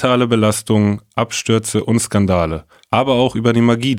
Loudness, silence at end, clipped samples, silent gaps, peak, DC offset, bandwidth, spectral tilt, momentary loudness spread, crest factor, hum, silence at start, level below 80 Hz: -16 LUFS; 0 s; under 0.1%; none; 0 dBFS; under 0.1%; 16 kHz; -5.5 dB/octave; 6 LU; 16 dB; none; 0 s; -42 dBFS